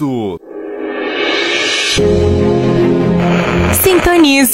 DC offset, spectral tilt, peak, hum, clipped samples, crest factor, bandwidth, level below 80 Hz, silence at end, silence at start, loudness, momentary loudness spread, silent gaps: under 0.1%; -4.5 dB/octave; 0 dBFS; none; under 0.1%; 12 dB; 16.5 kHz; -30 dBFS; 0 s; 0 s; -11 LUFS; 13 LU; none